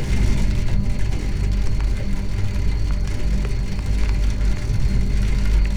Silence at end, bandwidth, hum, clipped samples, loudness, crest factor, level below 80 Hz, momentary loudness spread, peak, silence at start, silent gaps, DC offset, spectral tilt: 0 s; 10.5 kHz; none; under 0.1%; -24 LUFS; 12 dB; -20 dBFS; 4 LU; -6 dBFS; 0 s; none; under 0.1%; -6.5 dB/octave